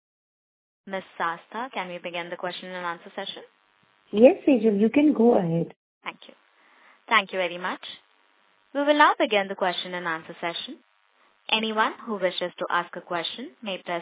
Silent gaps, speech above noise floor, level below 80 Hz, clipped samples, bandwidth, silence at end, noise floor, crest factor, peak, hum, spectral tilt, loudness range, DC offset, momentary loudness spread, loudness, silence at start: 5.76-6.01 s; 39 dB; -72 dBFS; under 0.1%; 4 kHz; 0 s; -64 dBFS; 24 dB; -2 dBFS; none; -9 dB/octave; 10 LU; under 0.1%; 17 LU; -25 LUFS; 0.85 s